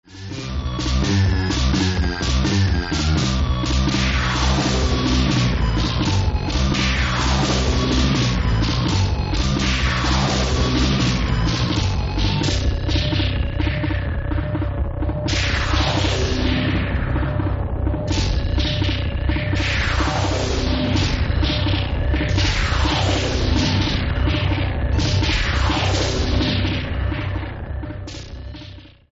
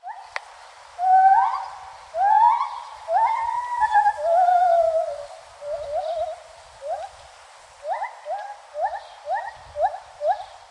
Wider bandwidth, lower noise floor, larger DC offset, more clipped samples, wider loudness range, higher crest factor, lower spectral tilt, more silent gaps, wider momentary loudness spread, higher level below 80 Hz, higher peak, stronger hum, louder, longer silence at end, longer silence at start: second, 8 kHz vs 11 kHz; second, -39 dBFS vs -47 dBFS; neither; neither; second, 2 LU vs 12 LU; about the same, 14 dB vs 16 dB; first, -5 dB/octave vs -1 dB/octave; neither; second, 5 LU vs 19 LU; first, -24 dBFS vs -60 dBFS; first, -4 dBFS vs -8 dBFS; neither; about the same, -20 LUFS vs -22 LUFS; about the same, 0.25 s vs 0.15 s; about the same, 0.1 s vs 0.05 s